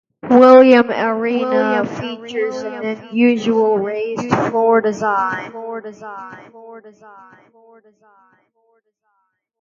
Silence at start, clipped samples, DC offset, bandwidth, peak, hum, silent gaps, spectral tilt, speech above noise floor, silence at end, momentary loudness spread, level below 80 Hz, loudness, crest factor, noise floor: 0.25 s; under 0.1%; under 0.1%; 7.4 kHz; 0 dBFS; none; none; -6.5 dB/octave; 51 dB; 2.7 s; 21 LU; -62 dBFS; -15 LUFS; 16 dB; -68 dBFS